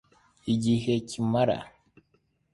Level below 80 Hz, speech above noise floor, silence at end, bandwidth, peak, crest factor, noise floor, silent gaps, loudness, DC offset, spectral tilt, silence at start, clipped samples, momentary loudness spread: -58 dBFS; 44 dB; 0.85 s; 11.5 kHz; -12 dBFS; 18 dB; -70 dBFS; none; -27 LUFS; under 0.1%; -6.5 dB/octave; 0.45 s; under 0.1%; 12 LU